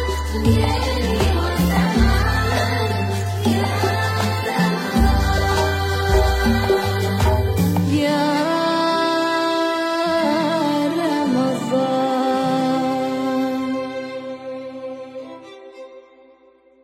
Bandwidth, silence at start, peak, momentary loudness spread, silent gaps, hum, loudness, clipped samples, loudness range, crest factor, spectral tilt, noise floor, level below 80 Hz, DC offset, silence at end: 16.5 kHz; 0 s; -4 dBFS; 13 LU; none; none; -19 LUFS; under 0.1%; 5 LU; 16 dB; -6 dB/octave; -52 dBFS; -28 dBFS; under 0.1%; 0.85 s